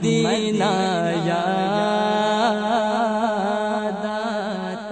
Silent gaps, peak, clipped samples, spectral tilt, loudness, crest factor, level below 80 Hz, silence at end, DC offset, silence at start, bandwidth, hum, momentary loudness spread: none; -8 dBFS; under 0.1%; -5 dB/octave; -21 LUFS; 14 dB; -58 dBFS; 0 s; under 0.1%; 0 s; 9.2 kHz; none; 6 LU